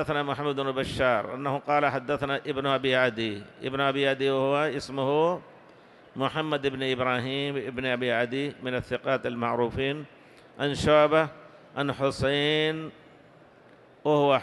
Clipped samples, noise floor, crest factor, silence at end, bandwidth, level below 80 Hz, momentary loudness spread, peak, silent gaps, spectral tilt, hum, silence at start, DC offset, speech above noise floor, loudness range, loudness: under 0.1%; -54 dBFS; 18 dB; 0 s; 12 kHz; -54 dBFS; 9 LU; -8 dBFS; none; -5.5 dB/octave; none; 0 s; under 0.1%; 28 dB; 3 LU; -27 LUFS